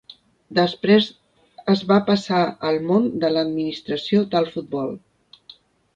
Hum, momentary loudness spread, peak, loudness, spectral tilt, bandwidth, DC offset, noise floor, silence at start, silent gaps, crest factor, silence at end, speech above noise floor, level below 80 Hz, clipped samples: none; 10 LU; -4 dBFS; -21 LUFS; -7 dB/octave; 7.6 kHz; under 0.1%; -50 dBFS; 0.5 s; none; 18 dB; 1 s; 30 dB; -62 dBFS; under 0.1%